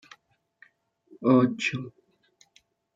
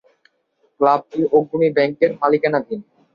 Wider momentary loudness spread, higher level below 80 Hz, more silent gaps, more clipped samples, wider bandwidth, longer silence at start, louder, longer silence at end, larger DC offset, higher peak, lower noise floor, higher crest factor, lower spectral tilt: first, 16 LU vs 6 LU; second, -74 dBFS vs -64 dBFS; neither; neither; first, 7.8 kHz vs 5.4 kHz; first, 1.2 s vs 0.8 s; second, -25 LUFS vs -18 LUFS; first, 1.05 s vs 0.35 s; neither; second, -8 dBFS vs -2 dBFS; about the same, -65 dBFS vs -64 dBFS; first, 22 dB vs 16 dB; second, -6.5 dB/octave vs -8.5 dB/octave